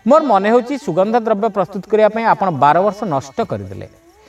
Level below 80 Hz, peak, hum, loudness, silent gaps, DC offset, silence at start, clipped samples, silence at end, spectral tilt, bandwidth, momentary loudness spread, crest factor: -56 dBFS; 0 dBFS; none; -15 LUFS; none; under 0.1%; 0.05 s; under 0.1%; 0.4 s; -7 dB/octave; 12 kHz; 10 LU; 14 dB